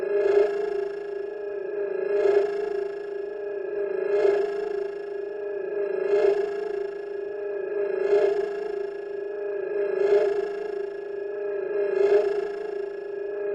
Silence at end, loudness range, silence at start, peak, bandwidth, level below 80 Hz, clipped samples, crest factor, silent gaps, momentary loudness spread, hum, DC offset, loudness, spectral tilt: 0 s; 2 LU; 0 s; -10 dBFS; 7.4 kHz; -68 dBFS; under 0.1%; 16 dB; none; 11 LU; none; under 0.1%; -27 LUFS; -5.5 dB/octave